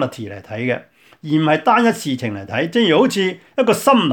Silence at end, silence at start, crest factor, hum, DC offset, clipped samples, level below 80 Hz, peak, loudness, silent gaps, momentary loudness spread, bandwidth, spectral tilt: 0 s; 0 s; 16 dB; none; under 0.1%; under 0.1%; -64 dBFS; 0 dBFS; -17 LUFS; none; 11 LU; 19 kHz; -5 dB/octave